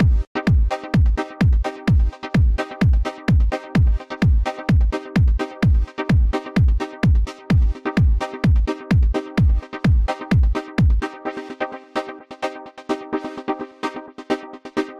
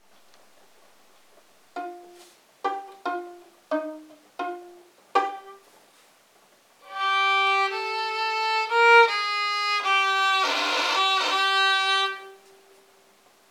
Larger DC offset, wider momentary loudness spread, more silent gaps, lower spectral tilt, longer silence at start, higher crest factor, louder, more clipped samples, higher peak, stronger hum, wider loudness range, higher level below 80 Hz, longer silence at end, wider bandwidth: neither; second, 10 LU vs 19 LU; first, 0.27-0.35 s vs none; first, -8 dB/octave vs 1 dB/octave; second, 0 s vs 1.75 s; second, 10 dB vs 20 dB; about the same, -21 LUFS vs -22 LUFS; neither; about the same, -8 dBFS vs -6 dBFS; neither; second, 6 LU vs 15 LU; first, -20 dBFS vs -90 dBFS; second, 0 s vs 1.15 s; second, 7.8 kHz vs 17 kHz